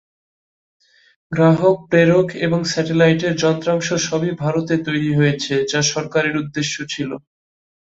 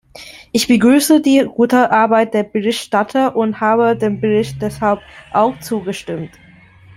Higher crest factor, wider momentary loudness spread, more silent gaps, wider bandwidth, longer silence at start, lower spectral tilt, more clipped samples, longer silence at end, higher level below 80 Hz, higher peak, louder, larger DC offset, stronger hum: about the same, 16 dB vs 14 dB; second, 9 LU vs 12 LU; neither; second, 8 kHz vs 16 kHz; first, 1.3 s vs 0.15 s; about the same, -5 dB/octave vs -5 dB/octave; neither; about the same, 0.75 s vs 0.7 s; second, -56 dBFS vs -50 dBFS; about the same, -2 dBFS vs -2 dBFS; second, -18 LUFS vs -15 LUFS; neither; neither